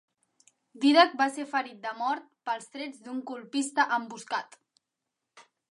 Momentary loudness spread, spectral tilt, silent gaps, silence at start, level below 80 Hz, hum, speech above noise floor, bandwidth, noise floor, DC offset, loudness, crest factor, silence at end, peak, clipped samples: 16 LU; -2 dB/octave; none; 0.75 s; under -90 dBFS; none; 57 dB; 11.5 kHz; -86 dBFS; under 0.1%; -28 LUFS; 24 dB; 0.3 s; -6 dBFS; under 0.1%